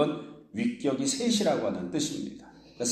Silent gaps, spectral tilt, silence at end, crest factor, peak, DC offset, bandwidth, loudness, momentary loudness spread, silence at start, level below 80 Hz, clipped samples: none; -4 dB/octave; 0 s; 20 dB; -10 dBFS; under 0.1%; 14.5 kHz; -29 LUFS; 14 LU; 0 s; -66 dBFS; under 0.1%